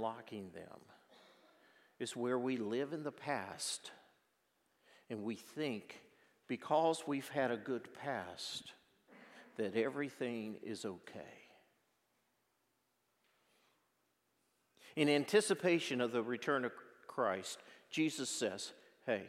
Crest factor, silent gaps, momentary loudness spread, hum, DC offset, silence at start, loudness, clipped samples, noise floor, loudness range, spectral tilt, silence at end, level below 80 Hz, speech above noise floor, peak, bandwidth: 24 dB; none; 18 LU; none; under 0.1%; 0 s; -39 LUFS; under 0.1%; -81 dBFS; 9 LU; -4 dB/octave; 0 s; under -90 dBFS; 43 dB; -18 dBFS; 16 kHz